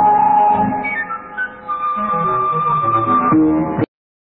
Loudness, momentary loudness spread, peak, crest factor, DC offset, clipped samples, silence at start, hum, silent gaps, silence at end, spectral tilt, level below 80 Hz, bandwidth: -16 LUFS; 11 LU; -4 dBFS; 12 dB; under 0.1%; under 0.1%; 0 s; none; none; 0.55 s; -11 dB/octave; -48 dBFS; 4 kHz